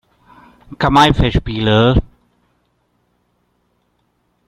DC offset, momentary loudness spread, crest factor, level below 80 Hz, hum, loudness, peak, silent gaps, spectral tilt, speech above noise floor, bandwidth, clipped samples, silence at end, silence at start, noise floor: under 0.1%; 8 LU; 18 dB; -28 dBFS; 60 Hz at -40 dBFS; -14 LUFS; 0 dBFS; none; -6.5 dB/octave; 51 dB; 14 kHz; under 0.1%; 2.45 s; 0.7 s; -64 dBFS